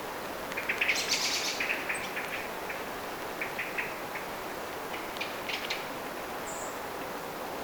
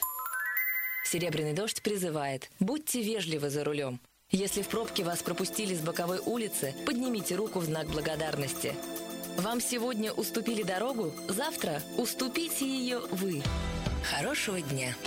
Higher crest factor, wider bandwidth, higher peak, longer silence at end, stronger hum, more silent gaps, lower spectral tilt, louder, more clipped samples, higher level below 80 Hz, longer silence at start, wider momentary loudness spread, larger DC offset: about the same, 20 dB vs 20 dB; first, over 20 kHz vs 16.5 kHz; about the same, -14 dBFS vs -14 dBFS; about the same, 0 s vs 0 s; neither; neither; second, -1.5 dB/octave vs -4 dB/octave; about the same, -33 LUFS vs -32 LUFS; neither; second, -62 dBFS vs -50 dBFS; about the same, 0 s vs 0 s; first, 10 LU vs 4 LU; neither